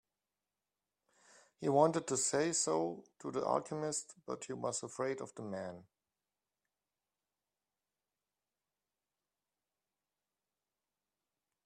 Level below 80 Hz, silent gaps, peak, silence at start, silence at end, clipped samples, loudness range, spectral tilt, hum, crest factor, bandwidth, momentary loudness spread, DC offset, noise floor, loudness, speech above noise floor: -84 dBFS; none; -16 dBFS; 1.6 s; 5.85 s; under 0.1%; 13 LU; -4 dB/octave; 50 Hz at -70 dBFS; 26 dB; 13.5 kHz; 14 LU; under 0.1%; under -90 dBFS; -36 LUFS; over 53 dB